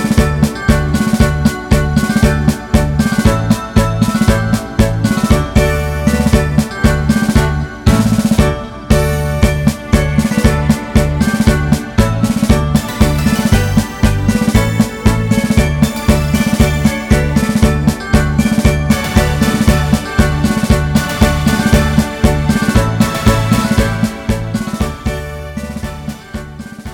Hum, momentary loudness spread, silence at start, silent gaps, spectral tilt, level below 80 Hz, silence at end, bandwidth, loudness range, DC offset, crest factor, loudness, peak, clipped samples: none; 5 LU; 0 s; none; -6 dB/octave; -20 dBFS; 0 s; 18.5 kHz; 1 LU; 0.1%; 12 dB; -13 LUFS; 0 dBFS; 0.3%